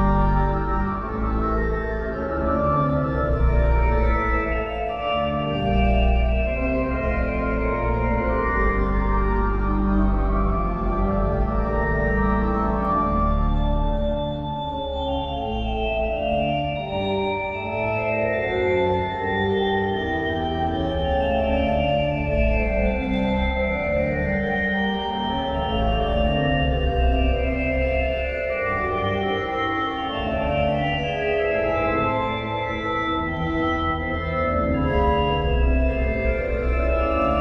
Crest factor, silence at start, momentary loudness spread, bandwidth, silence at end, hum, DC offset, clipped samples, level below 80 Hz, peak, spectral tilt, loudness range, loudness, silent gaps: 14 dB; 0 s; 4 LU; 5.6 kHz; 0 s; none; under 0.1%; under 0.1%; -26 dBFS; -8 dBFS; -8.5 dB/octave; 1 LU; -23 LUFS; none